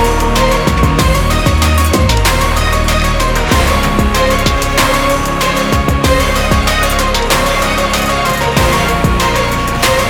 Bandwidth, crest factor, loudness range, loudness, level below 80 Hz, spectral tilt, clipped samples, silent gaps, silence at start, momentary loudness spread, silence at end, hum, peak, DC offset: 19 kHz; 12 dB; 0 LU; -12 LUFS; -16 dBFS; -4 dB/octave; under 0.1%; none; 0 s; 2 LU; 0 s; none; 0 dBFS; under 0.1%